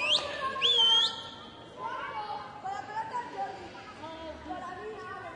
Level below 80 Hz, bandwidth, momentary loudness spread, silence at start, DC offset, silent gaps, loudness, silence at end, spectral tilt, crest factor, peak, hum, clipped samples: -64 dBFS; 11 kHz; 21 LU; 0 s; under 0.1%; none; -28 LUFS; 0 s; -1.5 dB/octave; 18 dB; -14 dBFS; none; under 0.1%